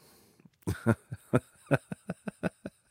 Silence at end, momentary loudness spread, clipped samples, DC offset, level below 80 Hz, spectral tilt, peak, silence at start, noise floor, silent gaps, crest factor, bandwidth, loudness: 0.2 s; 11 LU; under 0.1%; under 0.1%; -58 dBFS; -7.5 dB/octave; -12 dBFS; 0.65 s; -61 dBFS; none; 24 dB; 16 kHz; -34 LUFS